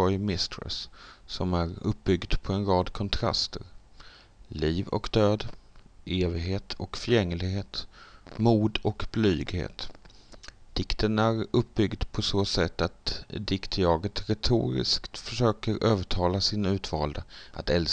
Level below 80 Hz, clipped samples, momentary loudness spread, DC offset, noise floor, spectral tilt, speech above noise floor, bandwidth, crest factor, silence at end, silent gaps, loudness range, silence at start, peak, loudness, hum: -40 dBFS; under 0.1%; 12 LU; under 0.1%; -51 dBFS; -6 dB/octave; 23 dB; 9.4 kHz; 20 dB; 0 s; none; 3 LU; 0 s; -8 dBFS; -28 LUFS; none